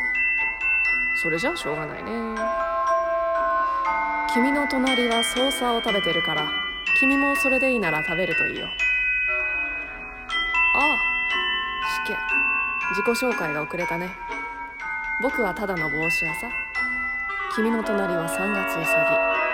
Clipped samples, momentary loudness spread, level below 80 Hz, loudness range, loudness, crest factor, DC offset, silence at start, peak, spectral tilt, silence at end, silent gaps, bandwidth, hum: under 0.1%; 8 LU; -48 dBFS; 4 LU; -22 LUFS; 16 dB; under 0.1%; 0 s; -8 dBFS; -3.5 dB/octave; 0 s; none; 17.5 kHz; none